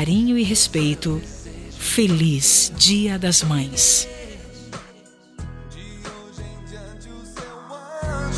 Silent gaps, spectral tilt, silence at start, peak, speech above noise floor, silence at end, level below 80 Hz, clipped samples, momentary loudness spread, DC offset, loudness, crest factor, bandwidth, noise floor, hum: none; -3 dB/octave; 0 s; -2 dBFS; 30 dB; 0 s; -40 dBFS; under 0.1%; 24 LU; under 0.1%; -17 LUFS; 20 dB; 11 kHz; -48 dBFS; none